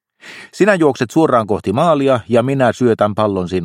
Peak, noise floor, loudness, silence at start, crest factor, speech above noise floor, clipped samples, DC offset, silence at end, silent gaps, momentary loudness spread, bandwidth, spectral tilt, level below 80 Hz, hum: 0 dBFS; -38 dBFS; -14 LUFS; 0.25 s; 14 dB; 24 dB; under 0.1%; under 0.1%; 0 s; none; 5 LU; 14.5 kHz; -6.5 dB/octave; -52 dBFS; none